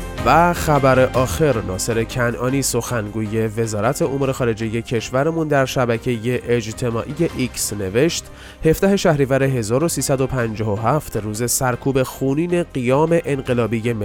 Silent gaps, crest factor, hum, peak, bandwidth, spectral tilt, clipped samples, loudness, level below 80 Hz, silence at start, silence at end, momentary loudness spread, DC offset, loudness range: none; 16 dB; none; -2 dBFS; 18 kHz; -5.5 dB/octave; under 0.1%; -19 LUFS; -38 dBFS; 0 s; 0 s; 6 LU; under 0.1%; 2 LU